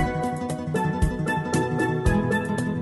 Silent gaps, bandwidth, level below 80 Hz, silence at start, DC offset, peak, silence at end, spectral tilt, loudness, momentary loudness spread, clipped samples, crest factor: none; 12 kHz; -34 dBFS; 0 s; under 0.1%; -8 dBFS; 0 s; -6.5 dB/octave; -25 LUFS; 5 LU; under 0.1%; 16 dB